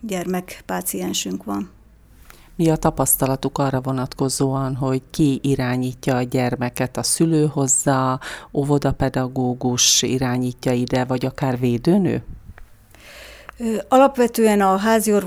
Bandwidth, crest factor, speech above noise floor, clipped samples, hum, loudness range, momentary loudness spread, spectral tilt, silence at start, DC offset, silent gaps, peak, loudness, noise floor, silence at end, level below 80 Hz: over 20 kHz; 18 dB; 29 dB; under 0.1%; none; 3 LU; 11 LU; -4.5 dB/octave; 0 s; under 0.1%; none; -2 dBFS; -20 LUFS; -48 dBFS; 0 s; -42 dBFS